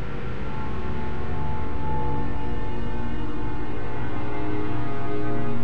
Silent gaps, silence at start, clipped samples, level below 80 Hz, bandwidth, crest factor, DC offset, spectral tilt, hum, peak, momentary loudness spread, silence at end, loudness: none; 0 s; under 0.1%; -36 dBFS; 7.6 kHz; 12 dB; 10%; -8.5 dB/octave; none; -12 dBFS; 4 LU; 0 s; -31 LUFS